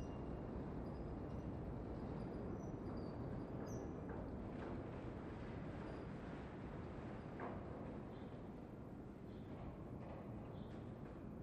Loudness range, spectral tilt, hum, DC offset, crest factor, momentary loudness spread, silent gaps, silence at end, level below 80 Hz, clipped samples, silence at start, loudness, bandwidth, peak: 4 LU; -8.5 dB/octave; none; under 0.1%; 14 dB; 5 LU; none; 0 s; -58 dBFS; under 0.1%; 0 s; -50 LUFS; 12.5 kHz; -34 dBFS